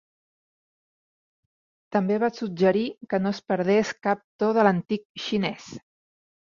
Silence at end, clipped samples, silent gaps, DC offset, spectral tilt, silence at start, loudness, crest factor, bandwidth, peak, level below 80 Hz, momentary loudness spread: 0.7 s; under 0.1%; 4.24-4.39 s, 5.05-5.15 s; under 0.1%; -6.5 dB/octave; 1.9 s; -25 LUFS; 22 dB; 7.4 kHz; -4 dBFS; -68 dBFS; 9 LU